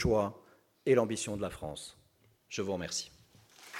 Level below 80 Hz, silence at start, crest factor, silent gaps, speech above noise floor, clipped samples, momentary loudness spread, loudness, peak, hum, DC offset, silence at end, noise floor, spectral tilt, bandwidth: -54 dBFS; 0 s; 20 dB; none; 36 dB; under 0.1%; 18 LU; -34 LUFS; -14 dBFS; none; under 0.1%; 0 s; -68 dBFS; -4.5 dB/octave; 16 kHz